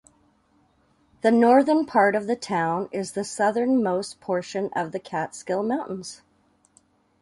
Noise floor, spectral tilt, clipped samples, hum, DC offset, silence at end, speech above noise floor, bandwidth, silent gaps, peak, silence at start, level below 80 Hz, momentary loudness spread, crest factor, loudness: -64 dBFS; -5.5 dB/octave; under 0.1%; none; under 0.1%; 1.05 s; 41 dB; 11.5 kHz; none; -4 dBFS; 1.25 s; -68 dBFS; 12 LU; 20 dB; -23 LUFS